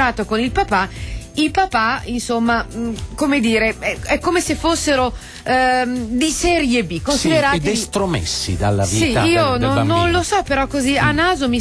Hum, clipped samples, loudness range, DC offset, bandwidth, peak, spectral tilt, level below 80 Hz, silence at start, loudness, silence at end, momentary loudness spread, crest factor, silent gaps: none; under 0.1%; 2 LU; under 0.1%; 11 kHz; -4 dBFS; -4.5 dB/octave; -34 dBFS; 0 s; -17 LUFS; 0 s; 6 LU; 12 dB; none